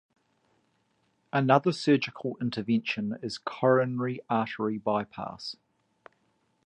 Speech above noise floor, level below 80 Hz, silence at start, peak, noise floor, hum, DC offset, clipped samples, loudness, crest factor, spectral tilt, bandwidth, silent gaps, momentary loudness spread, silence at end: 44 dB; -70 dBFS; 1.35 s; -6 dBFS; -72 dBFS; none; under 0.1%; under 0.1%; -28 LUFS; 22 dB; -6.5 dB/octave; 10 kHz; none; 13 LU; 1.1 s